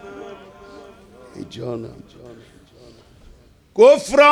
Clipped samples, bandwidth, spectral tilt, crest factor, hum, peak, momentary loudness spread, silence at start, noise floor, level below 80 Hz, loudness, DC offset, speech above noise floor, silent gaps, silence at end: under 0.1%; 12 kHz; -4 dB/octave; 20 dB; none; 0 dBFS; 26 LU; 0.15 s; -48 dBFS; -54 dBFS; -15 LUFS; under 0.1%; 32 dB; none; 0 s